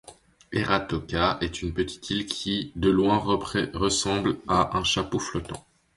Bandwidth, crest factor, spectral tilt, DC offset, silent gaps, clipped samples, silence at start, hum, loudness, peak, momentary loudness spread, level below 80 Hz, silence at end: 11.5 kHz; 20 dB; -4.5 dB/octave; under 0.1%; none; under 0.1%; 0.1 s; none; -26 LUFS; -8 dBFS; 8 LU; -44 dBFS; 0.35 s